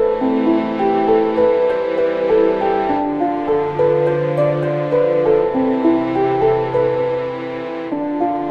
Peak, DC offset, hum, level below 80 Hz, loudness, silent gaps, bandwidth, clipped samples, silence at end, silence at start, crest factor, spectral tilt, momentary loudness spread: -4 dBFS; 0.3%; none; -48 dBFS; -17 LUFS; none; 5.8 kHz; under 0.1%; 0 s; 0 s; 14 dB; -9 dB/octave; 5 LU